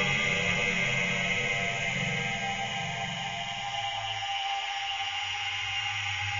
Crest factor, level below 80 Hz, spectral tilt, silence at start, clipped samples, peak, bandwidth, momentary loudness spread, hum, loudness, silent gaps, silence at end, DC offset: 16 dB; -54 dBFS; -2.5 dB/octave; 0 s; under 0.1%; -14 dBFS; 7.6 kHz; 6 LU; none; -29 LUFS; none; 0 s; under 0.1%